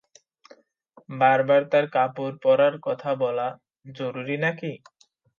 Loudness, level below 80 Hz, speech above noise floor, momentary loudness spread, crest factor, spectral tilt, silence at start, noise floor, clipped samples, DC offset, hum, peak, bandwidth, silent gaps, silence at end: -23 LUFS; -78 dBFS; 34 dB; 14 LU; 18 dB; -7 dB/octave; 1.1 s; -57 dBFS; under 0.1%; under 0.1%; none; -6 dBFS; 7 kHz; none; 0.6 s